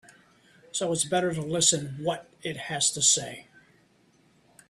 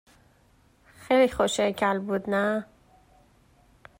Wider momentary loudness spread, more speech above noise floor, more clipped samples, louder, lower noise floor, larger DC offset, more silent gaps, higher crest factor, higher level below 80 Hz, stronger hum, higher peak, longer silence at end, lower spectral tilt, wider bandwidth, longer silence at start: first, 14 LU vs 6 LU; about the same, 36 dB vs 37 dB; neither; about the same, -25 LUFS vs -25 LUFS; about the same, -63 dBFS vs -61 dBFS; neither; neither; about the same, 22 dB vs 18 dB; second, -66 dBFS vs -58 dBFS; neither; about the same, -8 dBFS vs -10 dBFS; about the same, 1.25 s vs 1.35 s; second, -2 dB/octave vs -4.5 dB/octave; about the same, 15 kHz vs 16 kHz; second, 0.75 s vs 1 s